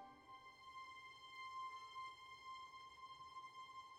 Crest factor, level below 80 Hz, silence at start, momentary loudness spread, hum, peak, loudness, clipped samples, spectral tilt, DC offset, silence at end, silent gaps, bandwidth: 14 dB; -86 dBFS; 0 s; 7 LU; none; -42 dBFS; -55 LUFS; under 0.1%; -1.5 dB/octave; under 0.1%; 0 s; none; 13.5 kHz